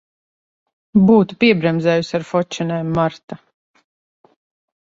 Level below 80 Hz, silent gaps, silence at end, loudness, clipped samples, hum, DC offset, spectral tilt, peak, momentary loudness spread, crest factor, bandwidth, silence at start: -52 dBFS; 3.24-3.28 s; 1.5 s; -17 LUFS; under 0.1%; none; under 0.1%; -7 dB/octave; -2 dBFS; 13 LU; 18 dB; 7.6 kHz; 0.95 s